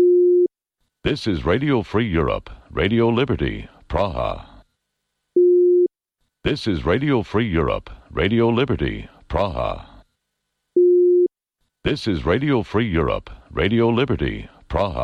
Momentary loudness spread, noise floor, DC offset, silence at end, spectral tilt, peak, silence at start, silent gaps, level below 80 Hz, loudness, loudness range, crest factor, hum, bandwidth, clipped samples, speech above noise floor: 12 LU; -77 dBFS; under 0.1%; 0 s; -8 dB/octave; -8 dBFS; 0 s; none; -36 dBFS; -20 LUFS; 3 LU; 12 dB; none; 6.8 kHz; under 0.1%; 56 dB